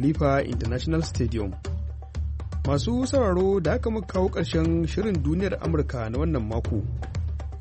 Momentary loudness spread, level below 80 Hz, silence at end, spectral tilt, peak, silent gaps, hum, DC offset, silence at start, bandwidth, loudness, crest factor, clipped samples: 9 LU; -32 dBFS; 0 s; -7 dB/octave; -10 dBFS; none; none; under 0.1%; 0 s; 8.4 kHz; -26 LUFS; 14 dB; under 0.1%